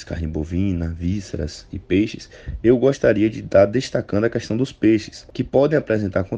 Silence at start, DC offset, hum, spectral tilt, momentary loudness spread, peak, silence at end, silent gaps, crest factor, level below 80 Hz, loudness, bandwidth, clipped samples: 0 s; under 0.1%; none; -7 dB/octave; 12 LU; -2 dBFS; 0 s; none; 16 dB; -38 dBFS; -20 LUFS; 9 kHz; under 0.1%